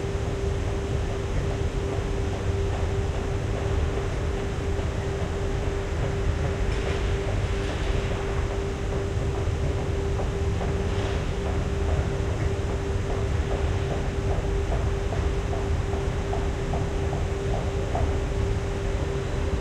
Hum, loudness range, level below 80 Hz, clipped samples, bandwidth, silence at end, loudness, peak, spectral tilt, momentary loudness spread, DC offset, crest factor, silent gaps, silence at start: none; 1 LU; -30 dBFS; under 0.1%; 11 kHz; 0 s; -28 LUFS; -12 dBFS; -6.5 dB/octave; 2 LU; under 0.1%; 14 dB; none; 0 s